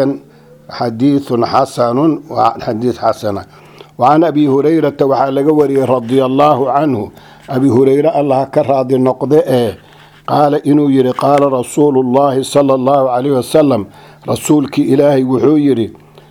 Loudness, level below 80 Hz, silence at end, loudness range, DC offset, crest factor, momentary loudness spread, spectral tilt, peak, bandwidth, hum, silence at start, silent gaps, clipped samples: -12 LUFS; -52 dBFS; 0.35 s; 2 LU; under 0.1%; 12 dB; 9 LU; -7 dB/octave; 0 dBFS; 16 kHz; none; 0 s; none; 0.1%